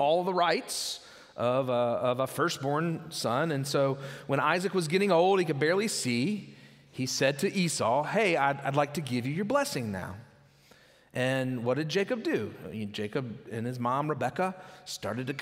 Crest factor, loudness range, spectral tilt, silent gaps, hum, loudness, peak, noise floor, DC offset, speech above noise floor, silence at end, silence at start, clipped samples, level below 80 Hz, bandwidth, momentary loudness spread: 20 dB; 5 LU; -4.5 dB/octave; none; none; -29 LUFS; -10 dBFS; -59 dBFS; under 0.1%; 30 dB; 0 s; 0 s; under 0.1%; -72 dBFS; 16 kHz; 11 LU